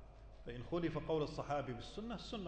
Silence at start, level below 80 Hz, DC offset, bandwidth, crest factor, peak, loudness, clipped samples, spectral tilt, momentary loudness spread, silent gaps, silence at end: 0 s; -56 dBFS; under 0.1%; 9 kHz; 14 dB; -28 dBFS; -43 LUFS; under 0.1%; -6.5 dB/octave; 12 LU; none; 0 s